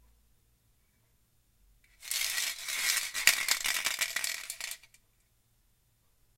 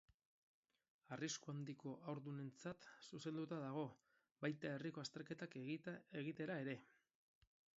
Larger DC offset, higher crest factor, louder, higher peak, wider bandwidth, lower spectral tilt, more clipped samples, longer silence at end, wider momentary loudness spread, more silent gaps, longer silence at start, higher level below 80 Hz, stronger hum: neither; first, 36 dB vs 22 dB; first, -30 LUFS vs -51 LUFS; first, 0 dBFS vs -30 dBFS; first, 17 kHz vs 7.6 kHz; second, 3 dB/octave vs -5.5 dB/octave; neither; first, 1.6 s vs 0.9 s; first, 14 LU vs 6 LU; second, none vs 4.31-4.35 s; first, 2 s vs 1.1 s; first, -66 dBFS vs -88 dBFS; neither